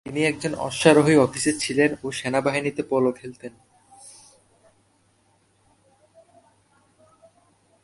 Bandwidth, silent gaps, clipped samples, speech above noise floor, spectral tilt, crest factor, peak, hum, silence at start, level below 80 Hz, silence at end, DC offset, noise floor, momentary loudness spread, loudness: 11.5 kHz; none; under 0.1%; 42 dB; -4.5 dB/octave; 24 dB; -2 dBFS; none; 0.05 s; -60 dBFS; 3.75 s; under 0.1%; -63 dBFS; 21 LU; -21 LUFS